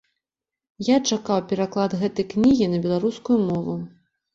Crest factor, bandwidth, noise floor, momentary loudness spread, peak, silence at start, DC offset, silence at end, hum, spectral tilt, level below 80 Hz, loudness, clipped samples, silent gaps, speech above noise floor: 16 dB; 7.8 kHz; -89 dBFS; 10 LU; -6 dBFS; 0.8 s; under 0.1%; 0.45 s; none; -6 dB/octave; -56 dBFS; -22 LUFS; under 0.1%; none; 67 dB